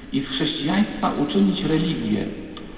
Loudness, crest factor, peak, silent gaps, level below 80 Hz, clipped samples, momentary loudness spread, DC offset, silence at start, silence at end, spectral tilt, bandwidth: -22 LUFS; 14 dB; -8 dBFS; none; -44 dBFS; under 0.1%; 6 LU; 0.2%; 0 s; 0 s; -10.5 dB/octave; 4 kHz